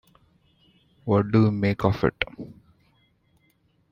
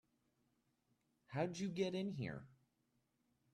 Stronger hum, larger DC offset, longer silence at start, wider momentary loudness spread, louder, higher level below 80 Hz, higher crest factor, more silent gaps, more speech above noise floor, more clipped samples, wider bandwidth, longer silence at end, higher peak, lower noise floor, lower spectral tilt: neither; neither; second, 1.05 s vs 1.3 s; first, 19 LU vs 8 LU; first, -23 LUFS vs -44 LUFS; first, -52 dBFS vs -80 dBFS; about the same, 24 dB vs 20 dB; neither; about the same, 43 dB vs 41 dB; neither; second, 6.2 kHz vs 11.5 kHz; first, 1.4 s vs 1 s; first, -4 dBFS vs -26 dBFS; second, -66 dBFS vs -83 dBFS; first, -8.5 dB/octave vs -6 dB/octave